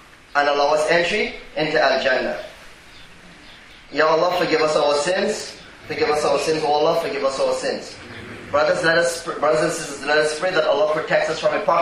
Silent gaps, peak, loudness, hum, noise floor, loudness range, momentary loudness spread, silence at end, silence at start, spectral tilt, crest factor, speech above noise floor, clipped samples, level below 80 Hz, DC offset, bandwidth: none; -2 dBFS; -20 LUFS; none; -43 dBFS; 2 LU; 11 LU; 0 s; 0.35 s; -3 dB/octave; 18 dB; 24 dB; under 0.1%; -52 dBFS; under 0.1%; 15.5 kHz